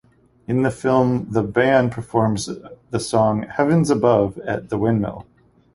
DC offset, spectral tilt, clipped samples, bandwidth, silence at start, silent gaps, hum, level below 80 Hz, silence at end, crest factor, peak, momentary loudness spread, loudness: under 0.1%; -6.5 dB/octave; under 0.1%; 11.5 kHz; 0.5 s; none; none; -48 dBFS; 0.55 s; 18 dB; -2 dBFS; 12 LU; -20 LUFS